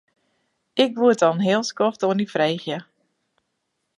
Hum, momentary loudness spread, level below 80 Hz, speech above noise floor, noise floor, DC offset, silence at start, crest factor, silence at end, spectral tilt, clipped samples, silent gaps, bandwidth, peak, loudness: none; 11 LU; -74 dBFS; 55 dB; -76 dBFS; under 0.1%; 0.75 s; 18 dB; 1.15 s; -5 dB/octave; under 0.1%; none; 11.5 kHz; -4 dBFS; -21 LUFS